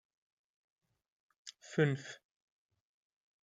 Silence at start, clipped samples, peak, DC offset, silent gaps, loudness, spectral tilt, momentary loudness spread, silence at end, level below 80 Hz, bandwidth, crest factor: 1.45 s; under 0.1%; -16 dBFS; under 0.1%; none; -35 LUFS; -6.5 dB/octave; 21 LU; 1.3 s; -80 dBFS; 9.2 kHz; 26 dB